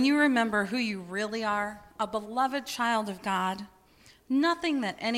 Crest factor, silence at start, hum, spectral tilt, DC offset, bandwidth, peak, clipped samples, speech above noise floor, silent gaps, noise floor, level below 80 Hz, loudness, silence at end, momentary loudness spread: 18 dB; 0 s; none; -4 dB/octave; under 0.1%; 15.5 kHz; -12 dBFS; under 0.1%; 30 dB; none; -59 dBFS; -64 dBFS; -29 LUFS; 0 s; 9 LU